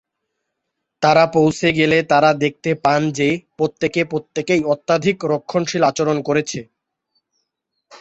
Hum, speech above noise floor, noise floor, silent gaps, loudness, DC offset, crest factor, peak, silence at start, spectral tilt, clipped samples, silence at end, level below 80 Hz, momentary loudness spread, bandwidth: none; 60 dB; -77 dBFS; none; -17 LUFS; under 0.1%; 18 dB; -2 dBFS; 1 s; -5 dB/octave; under 0.1%; 0.05 s; -56 dBFS; 7 LU; 8.2 kHz